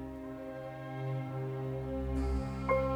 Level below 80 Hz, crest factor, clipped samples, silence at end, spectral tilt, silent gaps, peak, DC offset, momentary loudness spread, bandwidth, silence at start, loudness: -42 dBFS; 18 dB; under 0.1%; 0 s; -8.5 dB/octave; none; -18 dBFS; under 0.1%; 10 LU; over 20 kHz; 0 s; -37 LUFS